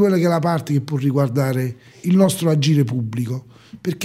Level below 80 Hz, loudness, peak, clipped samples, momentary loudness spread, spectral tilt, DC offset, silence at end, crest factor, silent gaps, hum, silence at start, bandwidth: -62 dBFS; -19 LUFS; -4 dBFS; under 0.1%; 12 LU; -6.5 dB/octave; under 0.1%; 0 s; 16 dB; none; none; 0 s; 16 kHz